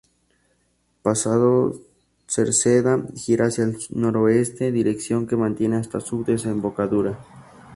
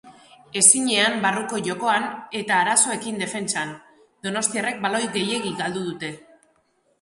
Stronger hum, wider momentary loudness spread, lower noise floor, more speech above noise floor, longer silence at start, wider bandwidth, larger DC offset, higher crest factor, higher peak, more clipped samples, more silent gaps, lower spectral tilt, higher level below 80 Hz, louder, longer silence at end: neither; second, 8 LU vs 15 LU; about the same, -67 dBFS vs -65 dBFS; about the same, 46 dB vs 43 dB; first, 1.05 s vs 0.05 s; about the same, 11.5 kHz vs 12 kHz; neither; second, 18 dB vs 24 dB; second, -4 dBFS vs 0 dBFS; neither; neither; first, -5.5 dB/octave vs -1.5 dB/octave; first, -56 dBFS vs -68 dBFS; about the same, -21 LUFS vs -21 LUFS; second, 0 s vs 0.85 s